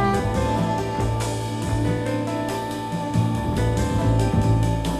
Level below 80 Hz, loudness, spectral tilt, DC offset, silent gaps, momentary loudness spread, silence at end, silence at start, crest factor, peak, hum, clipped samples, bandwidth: -32 dBFS; -23 LUFS; -6.5 dB/octave; 0.1%; none; 6 LU; 0 s; 0 s; 14 dB; -8 dBFS; none; under 0.1%; 14 kHz